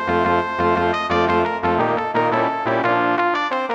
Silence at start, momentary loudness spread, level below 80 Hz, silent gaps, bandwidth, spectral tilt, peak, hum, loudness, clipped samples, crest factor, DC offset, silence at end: 0 s; 2 LU; -48 dBFS; none; 8.4 kHz; -6.5 dB/octave; -6 dBFS; none; -19 LUFS; under 0.1%; 14 dB; under 0.1%; 0 s